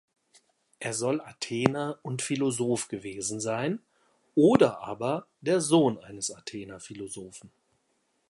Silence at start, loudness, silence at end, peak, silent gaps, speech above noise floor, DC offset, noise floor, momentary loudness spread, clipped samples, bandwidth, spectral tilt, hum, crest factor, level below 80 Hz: 0.8 s; -28 LUFS; 0.8 s; -2 dBFS; none; 46 dB; under 0.1%; -74 dBFS; 17 LU; under 0.1%; 11.5 kHz; -5 dB/octave; none; 26 dB; -66 dBFS